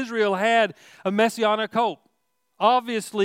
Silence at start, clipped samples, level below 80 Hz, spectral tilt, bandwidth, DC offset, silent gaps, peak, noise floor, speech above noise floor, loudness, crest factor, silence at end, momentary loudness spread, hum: 0 s; under 0.1%; -78 dBFS; -4 dB/octave; 16 kHz; under 0.1%; none; -6 dBFS; -74 dBFS; 52 dB; -22 LUFS; 18 dB; 0 s; 7 LU; none